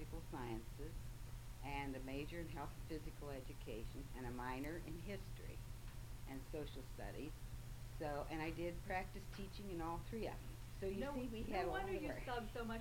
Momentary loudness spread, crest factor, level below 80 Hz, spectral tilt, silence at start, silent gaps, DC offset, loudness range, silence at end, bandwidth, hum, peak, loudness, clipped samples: 9 LU; 18 dB; -54 dBFS; -6 dB/octave; 0 s; none; under 0.1%; 4 LU; 0 s; 16.5 kHz; none; -30 dBFS; -49 LUFS; under 0.1%